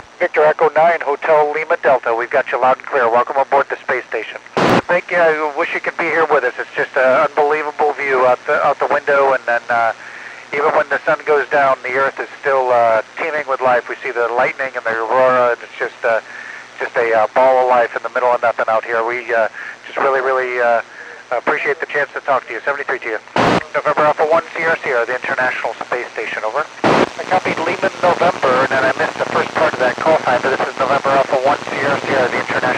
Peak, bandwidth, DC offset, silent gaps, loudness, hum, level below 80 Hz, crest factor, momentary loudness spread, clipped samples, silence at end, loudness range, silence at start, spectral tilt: 0 dBFS; 10.5 kHz; under 0.1%; none; -16 LUFS; none; -56 dBFS; 16 dB; 8 LU; under 0.1%; 0 s; 3 LU; 0.2 s; -4.5 dB/octave